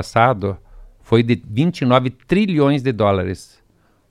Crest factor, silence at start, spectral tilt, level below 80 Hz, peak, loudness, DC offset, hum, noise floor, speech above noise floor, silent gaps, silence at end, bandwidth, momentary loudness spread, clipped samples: 18 dB; 0 s; -7.5 dB/octave; -46 dBFS; 0 dBFS; -18 LUFS; under 0.1%; none; -57 dBFS; 41 dB; none; 0.65 s; 12 kHz; 10 LU; under 0.1%